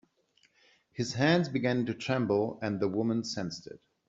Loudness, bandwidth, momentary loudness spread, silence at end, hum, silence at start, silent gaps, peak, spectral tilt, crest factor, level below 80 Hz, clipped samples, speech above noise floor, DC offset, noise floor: -30 LUFS; 7.8 kHz; 13 LU; 0.3 s; none; 0.95 s; none; -12 dBFS; -6 dB/octave; 20 dB; -68 dBFS; under 0.1%; 39 dB; under 0.1%; -69 dBFS